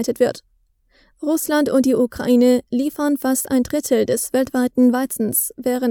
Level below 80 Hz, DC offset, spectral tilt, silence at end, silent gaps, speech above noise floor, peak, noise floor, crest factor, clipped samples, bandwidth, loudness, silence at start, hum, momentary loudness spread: -54 dBFS; under 0.1%; -4 dB/octave; 0 s; none; 41 dB; -4 dBFS; -59 dBFS; 16 dB; under 0.1%; 20 kHz; -18 LUFS; 0 s; none; 6 LU